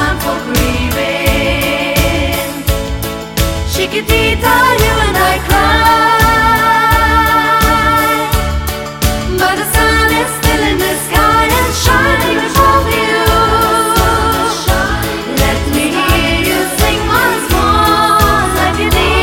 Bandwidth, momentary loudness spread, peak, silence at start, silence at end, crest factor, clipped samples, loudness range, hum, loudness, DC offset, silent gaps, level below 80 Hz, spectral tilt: 17 kHz; 6 LU; 0 dBFS; 0 s; 0 s; 12 dB; under 0.1%; 4 LU; none; -11 LUFS; under 0.1%; none; -20 dBFS; -4 dB/octave